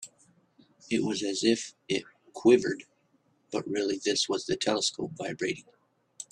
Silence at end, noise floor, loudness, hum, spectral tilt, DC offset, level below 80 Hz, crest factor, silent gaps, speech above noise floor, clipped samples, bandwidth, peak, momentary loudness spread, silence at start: 0.1 s; -69 dBFS; -29 LUFS; none; -3.5 dB/octave; under 0.1%; -70 dBFS; 22 dB; none; 41 dB; under 0.1%; 11.5 kHz; -8 dBFS; 14 LU; 0 s